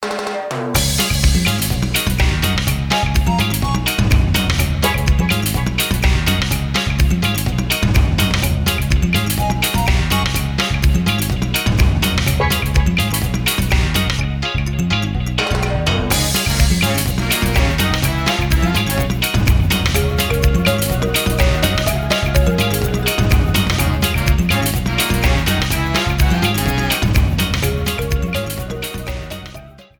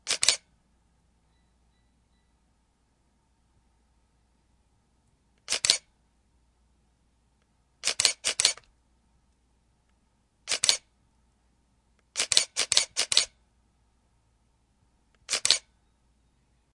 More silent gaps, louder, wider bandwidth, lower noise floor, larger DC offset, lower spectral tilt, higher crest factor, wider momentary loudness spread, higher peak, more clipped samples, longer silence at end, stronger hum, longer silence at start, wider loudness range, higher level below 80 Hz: neither; first, -17 LUFS vs -25 LUFS; first, 20 kHz vs 12 kHz; second, -37 dBFS vs -69 dBFS; neither; first, -4.5 dB/octave vs 2 dB/octave; second, 14 dB vs 34 dB; second, 4 LU vs 8 LU; about the same, 0 dBFS vs 0 dBFS; neither; second, 0.2 s vs 1.15 s; neither; about the same, 0 s vs 0.05 s; second, 1 LU vs 5 LU; first, -20 dBFS vs -68 dBFS